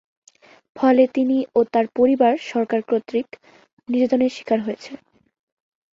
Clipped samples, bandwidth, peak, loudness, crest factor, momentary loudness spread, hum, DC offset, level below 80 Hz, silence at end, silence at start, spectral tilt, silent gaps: under 0.1%; 7.6 kHz; -4 dBFS; -20 LUFS; 18 dB; 10 LU; none; under 0.1%; -66 dBFS; 1 s; 0.75 s; -6 dB/octave; 3.73-3.77 s